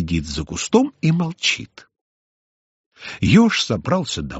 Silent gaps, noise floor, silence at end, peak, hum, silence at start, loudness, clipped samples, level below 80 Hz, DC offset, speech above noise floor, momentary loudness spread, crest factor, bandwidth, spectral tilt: 2.01-2.92 s; under -90 dBFS; 0 s; -2 dBFS; none; 0 s; -19 LUFS; under 0.1%; -42 dBFS; under 0.1%; over 71 dB; 13 LU; 18 dB; 8 kHz; -4.5 dB/octave